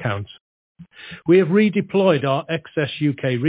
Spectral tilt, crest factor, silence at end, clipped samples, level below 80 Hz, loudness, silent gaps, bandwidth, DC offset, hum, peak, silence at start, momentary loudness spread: -11 dB/octave; 16 dB; 0 s; under 0.1%; -56 dBFS; -19 LUFS; 0.41-0.75 s; 4 kHz; under 0.1%; none; -4 dBFS; 0 s; 17 LU